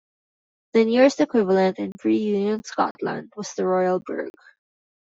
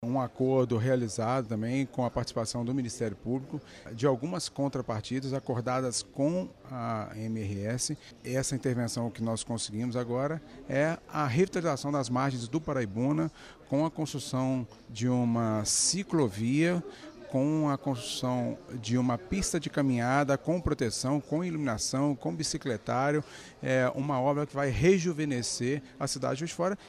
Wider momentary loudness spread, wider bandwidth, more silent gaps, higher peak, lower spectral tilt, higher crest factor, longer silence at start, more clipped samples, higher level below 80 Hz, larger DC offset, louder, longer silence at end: first, 14 LU vs 8 LU; second, 8 kHz vs 14.5 kHz; first, 2.91-2.95 s vs none; first, -4 dBFS vs -12 dBFS; about the same, -6 dB/octave vs -5 dB/octave; about the same, 18 dB vs 18 dB; first, 0.75 s vs 0 s; neither; second, -70 dBFS vs -54 dBFS; neither; first, -22 LUFS vs -31 LUFS; first, 0.75 s vs 0 s